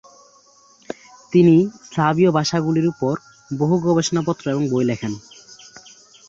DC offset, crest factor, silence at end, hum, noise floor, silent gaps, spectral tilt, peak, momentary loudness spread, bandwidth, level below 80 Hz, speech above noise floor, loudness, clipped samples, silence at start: under 0.1%; 16 dB; 1.1 s; none; -52 dBFS; none; -6.5 dB/octave; -4 dBFS; 20 LU; 7.8 kHz; -58 dBFS; 35 dB; -19 LUFS; under 0.1%; 1.3 s